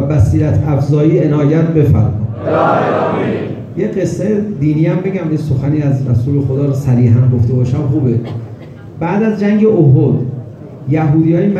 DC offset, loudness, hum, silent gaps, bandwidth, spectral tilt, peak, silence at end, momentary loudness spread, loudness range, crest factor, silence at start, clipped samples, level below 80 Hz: under 0.1%; -13 LUFS; none; none; 7.6 kHz; -9.5 dB/octave; 0 dBFS; 0 s; 10 LU; 2 LU; 12 dB; 0 s; under 0.1%; -36 dBFS